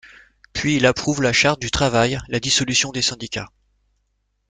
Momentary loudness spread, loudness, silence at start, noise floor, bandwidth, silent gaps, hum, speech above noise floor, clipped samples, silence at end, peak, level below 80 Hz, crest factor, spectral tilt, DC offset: 13 LU; -19 LUFS; 0.05 s; -70 dBFS; 9.8 kHz; none; 50 Hz at -50 dBFS; 50 dB; under 0.1%; 1 s; -2 dBFS; -44 dBFS; 20 dB; -3.5 dB/octave; under 0.1%